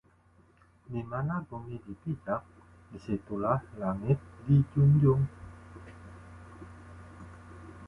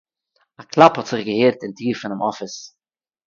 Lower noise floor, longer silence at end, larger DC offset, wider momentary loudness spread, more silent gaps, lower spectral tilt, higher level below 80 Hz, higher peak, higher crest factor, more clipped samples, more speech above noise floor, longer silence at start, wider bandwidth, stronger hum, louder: second, -63 dBFS vs under -90 dBFS; second, 0 s vs 0.6 s; neither; first, 25 LU vs 17 LU; neither; first, -10.5 dB/octave vs -5.5 dB/octave; first, -54 dBFS vs -64 dBFS; second, -14 dBFS vs 0 dBFS; about the same, 18 dB vs 20 dB; neither; second, 34 dB vs over 71 dB; first, 0.9 s vs 0.6 s; second, 3.1 kHz vs 7.4 kHz; neither; second, -30 LUFS vs -18 LUFS